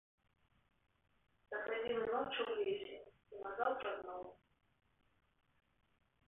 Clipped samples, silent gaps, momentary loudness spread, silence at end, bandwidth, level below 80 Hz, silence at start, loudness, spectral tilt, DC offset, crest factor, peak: under 0.1%; none; 13 LU; 1.95 s; 3.9 kHz; -78 dBFS; 1.5 s; -42 LUFS; 1.5 dB/octave; under 0.1%; 22 dB; -24 dBFS